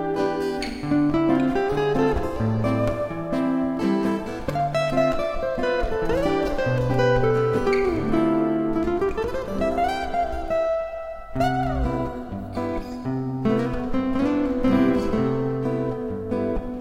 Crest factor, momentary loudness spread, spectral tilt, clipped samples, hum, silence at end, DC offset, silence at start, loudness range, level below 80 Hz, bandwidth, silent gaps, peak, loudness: 16 dB; 8 LU; -7.5 dB/octave; under 0.1%; none; 0 s; under 0.1%; 0 s; 4 LU; -36 dBFS; 15.5 kHz; none; -8 dBFS; -24 LUFS